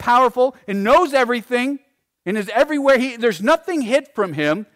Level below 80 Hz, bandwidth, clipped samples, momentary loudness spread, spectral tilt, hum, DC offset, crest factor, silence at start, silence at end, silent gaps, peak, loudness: -52 dBFS; 16 kHz; under 0.1%; 10 LU; -5 dB/octave; none; under 0.1%; 12 dB; 0 s; 0.1 s; none; -6 dBFS; -18 LUFS